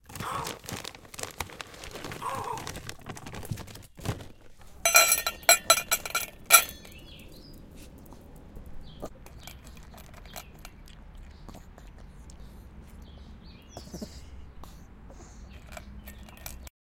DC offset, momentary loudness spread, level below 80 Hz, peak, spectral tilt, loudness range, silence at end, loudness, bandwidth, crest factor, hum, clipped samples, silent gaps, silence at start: under 0.1%; 29 LU; -50 dBFS; 0 dBFS; -1 dB/octave; 25 LU; 0.3 s; -25 LUFS; 17 kHz; 32 dB; none; under 0.1%; none; 0.05 s